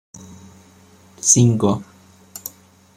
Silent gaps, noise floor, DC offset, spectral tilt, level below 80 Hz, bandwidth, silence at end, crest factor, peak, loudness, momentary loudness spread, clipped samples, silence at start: none; -49 dBFS; under 0.1%; -5 dB/octave; -56 dBFS; 15.5 kHz; 0.5 s; 20 dB; -2 dBFS; -16 LUFS; 22 LU; under 0.1%; 0.2 s